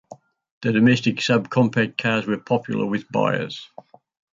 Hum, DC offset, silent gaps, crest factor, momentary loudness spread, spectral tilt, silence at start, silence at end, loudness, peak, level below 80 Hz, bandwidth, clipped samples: none; under 0.1%; 0.51-0.61 s; 16 dB; 9 LU; -6 dB/octave; 0.1 s; 0.7 s; -21 LUFS; -6 dBFS; -62 dBFS; 7.6 kHz; under 0.1%